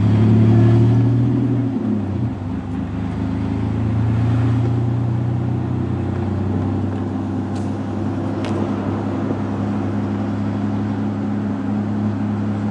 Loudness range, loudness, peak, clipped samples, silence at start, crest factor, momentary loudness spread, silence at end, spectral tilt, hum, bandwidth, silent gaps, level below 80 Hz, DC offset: 4 LU; -20 LUFS; -4 dBFS; under 0.1%; 0 s; 14 dB; 9 LU; 0 s; -9.5 dB/octave; none; 7 kHz; none; -42 dBFS; under 0.1%